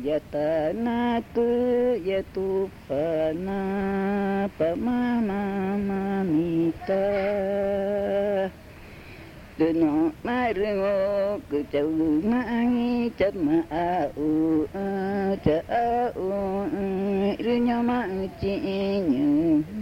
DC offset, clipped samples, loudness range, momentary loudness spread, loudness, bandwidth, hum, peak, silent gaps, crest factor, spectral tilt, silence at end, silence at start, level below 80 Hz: under 0.1%; under 0.1%; 2 LU; 5 LU; -25 LUFS; 16 kHz; none; -8 dBFS; none; 18 dB; -8 dB/octave; 0 s; 0 s; -50 dBFS